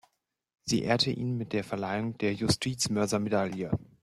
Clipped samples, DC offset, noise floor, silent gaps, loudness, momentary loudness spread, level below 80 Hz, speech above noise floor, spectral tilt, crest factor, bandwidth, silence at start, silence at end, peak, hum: under 0.1%; under 0.1%; -78 dBFS; none; -30 LUFS; 6 LU; -58 dBFS; 48 dB; -4.5 dB/octave; 20 dB; 14 kHz; 0.65 s; 0.2 s; -10 dBFS; none